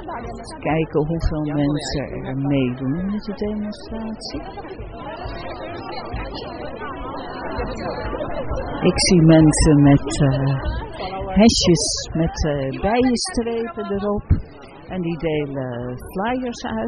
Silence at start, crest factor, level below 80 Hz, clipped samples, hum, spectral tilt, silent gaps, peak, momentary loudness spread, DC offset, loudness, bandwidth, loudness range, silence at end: 0 s; 18 dB; -34 dBFS; under 0.1%; none; -5.5 dB/octave; none; -2 dBFS; 17 LU; under 0.1%; -21 LUFS; 10 kHz; 14 LU; 0 s